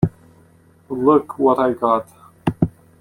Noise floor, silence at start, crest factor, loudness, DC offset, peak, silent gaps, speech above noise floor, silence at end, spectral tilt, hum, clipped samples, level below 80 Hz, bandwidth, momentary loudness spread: -52 dBFS; 0 s; 18 dB; -19 LUFS; under 0.1%; -2 dBFS; none; 35 dB; 0.3 s; -9 dB/octave; none; under 0.1%; -46 dBFS; 13.5 kHz; 10 LU